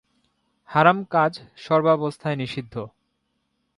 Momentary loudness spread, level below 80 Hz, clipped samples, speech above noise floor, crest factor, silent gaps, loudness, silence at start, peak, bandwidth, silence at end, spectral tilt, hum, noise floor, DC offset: 17 LU; -64 dBFS; under 0.1%; 52 dB; 22 dB; none; -22 LUFS; 0.7 s; -2 dBFS; 11.5 kHz; 0.9 s; -7 dB/octave; none; -73 dBFS; under 0.1%